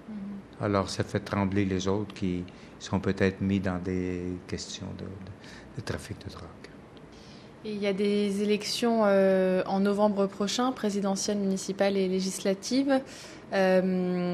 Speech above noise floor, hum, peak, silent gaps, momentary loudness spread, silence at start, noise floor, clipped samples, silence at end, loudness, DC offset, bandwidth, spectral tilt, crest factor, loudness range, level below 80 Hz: 21 dB; none; -10 dBFS; none; 19 LU; 0 s; -48 dBFS; under 0.1%; 0 s; -28 LUFS; under 0.1%; 13 kHz; -5.5 dB/octave; 20 dB; 11 LU; -58 dBFS